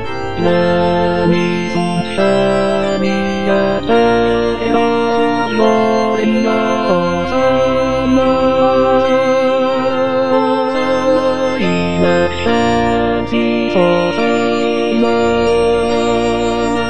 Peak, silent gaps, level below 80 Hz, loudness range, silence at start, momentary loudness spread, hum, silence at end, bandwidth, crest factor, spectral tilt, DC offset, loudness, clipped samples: 0 dBFS; none; -38 dBFS; 1 LU; 0 s; 3 LU; none; 0 s; 10 kHz; 12 dB; -6 dB/octave; 3%; -14 LUFS; under 0.1%